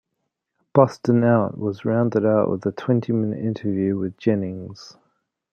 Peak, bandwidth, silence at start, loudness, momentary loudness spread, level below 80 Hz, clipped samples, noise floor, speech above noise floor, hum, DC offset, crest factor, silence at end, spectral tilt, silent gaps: -2 dBFS; 7 kHz; 0.75 s; -21 LUFS; 8 LU; -66 dBFS; under 0.1%; -78 dBFS; 58 dB; none; under 0.1%; 20 dB; 0.6 s; -9 dB/octave; none